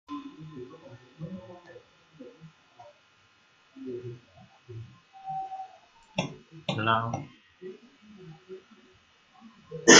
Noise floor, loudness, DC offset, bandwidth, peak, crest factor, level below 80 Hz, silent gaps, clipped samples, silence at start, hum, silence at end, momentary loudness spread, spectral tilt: -63 dBFS; -35 LUFS; under 0.1%; 7.4 kHz; 0 dBFS; 30 dB; -70 dBFS; none; under 0.1%; 0.1 s; none; 0 s; 25 LU; -2 dB/octave